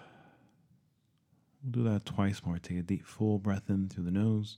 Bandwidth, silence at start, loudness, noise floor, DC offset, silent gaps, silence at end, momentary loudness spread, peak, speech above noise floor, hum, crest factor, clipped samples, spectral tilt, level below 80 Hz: 11 kHz; 0 s; -33 LUFS; -73 dBFS; under 0.1%; none; 0 s; 7 LU; -16 dBFS; 41 dB; none; 18 dB; under 0.1%; -8 dB/octave; -62 dBFS